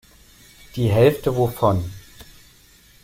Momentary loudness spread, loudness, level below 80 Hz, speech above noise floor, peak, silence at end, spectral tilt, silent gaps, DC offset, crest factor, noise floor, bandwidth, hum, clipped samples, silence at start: 18 LU; -19 LUFS; -46 dBFS; 33 dB; -4 dBFS; 1.05 s; -7.5 dB/octave; none; under 0.1%; 18 dB; -51 dBFS; 16.5 kHz; none; under 0.1%; 0.75 s